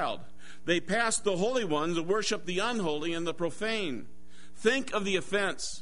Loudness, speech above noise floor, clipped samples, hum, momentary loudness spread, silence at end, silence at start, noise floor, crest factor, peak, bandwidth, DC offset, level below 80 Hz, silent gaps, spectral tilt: -30 LUFS; 20 dB; under 0.1%; none; 6 LU; 0 s; 0 s; -50 dBFS; 20 dB; -12 dBFS; 11 kHz; 1%; -60 dBFS; none; -3.5 dB/octave